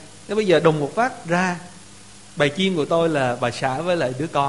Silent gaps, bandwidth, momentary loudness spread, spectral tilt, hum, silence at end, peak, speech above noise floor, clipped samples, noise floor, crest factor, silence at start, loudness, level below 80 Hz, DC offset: none; 11.5 kHz; 8 LU; -5.5 dB/octave; none; 0 s; -2 dBFS; 24 dB; under 0.1%; -45 dBFS; 20 dB; 0 s; -21 LUFS; -56 dBFS; 0.4%